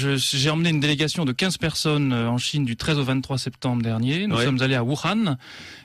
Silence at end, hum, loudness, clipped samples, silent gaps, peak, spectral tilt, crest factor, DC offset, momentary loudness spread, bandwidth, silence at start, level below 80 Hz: 0 s; none; -22 LUFS; under 0.1%; none; -10 dBFS; -5 dB/octave; 12 dB; under 0.1%; 5 LU; 14 kHz; 0 s; -52 dBFS